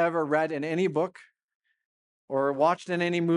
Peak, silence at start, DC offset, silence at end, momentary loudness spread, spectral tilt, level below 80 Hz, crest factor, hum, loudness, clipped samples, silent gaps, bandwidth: -12 dBFS; 0 s; under 0.1%; 0 s; 6 LU; -6.5 dB/octave; -82 dBFS; 16 dB; none; -27 LUFS; under 0.1%; 1.44-1.48 s, 1.55-1.60 s, 1.85-2.28 s; 11 kHz